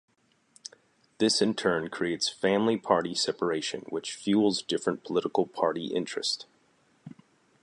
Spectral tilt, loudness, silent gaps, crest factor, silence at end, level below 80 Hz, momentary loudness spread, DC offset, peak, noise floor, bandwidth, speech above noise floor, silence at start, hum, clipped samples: -4 dB/octave; -28 LUFS; none; 22 dB; 0.55 s; -70 dBFS; 10 LU; under 0.1%; -8 dBFS; -66 dBFS; 11.5 kHz; 38 dB; 1.2 s; none; under 0.1%